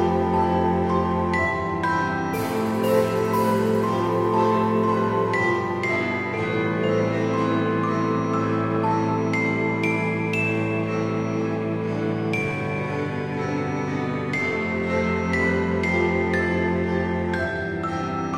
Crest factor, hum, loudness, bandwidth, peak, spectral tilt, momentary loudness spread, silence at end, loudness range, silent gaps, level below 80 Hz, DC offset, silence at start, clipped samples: 16 dB; none; -23 LUFS; 16 kHz; -6 dBFS; -7 dB/octave; 5 LU; 0 s; 3 LU; none; -48 dBFS; under 0.1%; 0 s; under 0.1%